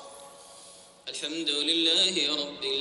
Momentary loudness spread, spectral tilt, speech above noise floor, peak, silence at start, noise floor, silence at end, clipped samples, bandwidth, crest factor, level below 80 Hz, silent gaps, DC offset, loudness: 21 LU; -1 dB/octave; 24 dB; -10 dBFS; 0 s; -51 dBFS; 0 s; under 0.1%; 11.5 kHz; 18 dB; -72 dBFS; none; under 0.1%; -25 LUFS